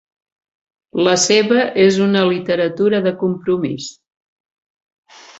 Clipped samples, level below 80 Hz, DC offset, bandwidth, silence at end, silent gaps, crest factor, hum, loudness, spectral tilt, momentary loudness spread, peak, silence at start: under 0.1%; -60 dBFS; under 0.1%; 8.2 kHz; 1.5 s; none; 16 dB; none; -15 LUFS; -4 dB/octave; 10 LU; -2 dBFS; 0.95 s